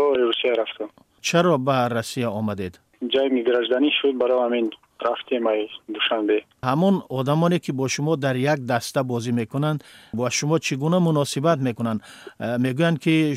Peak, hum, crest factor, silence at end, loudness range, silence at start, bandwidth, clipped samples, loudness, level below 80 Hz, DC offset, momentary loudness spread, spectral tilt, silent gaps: -6 dBFS; none; 16 dB; 0 s; 1 LU; 0 s; 15.5 kHz; under 0.1%; -22 LUFS; -64 dBFS; under 0.1%; 9 LU; -5.5 dB/octave; none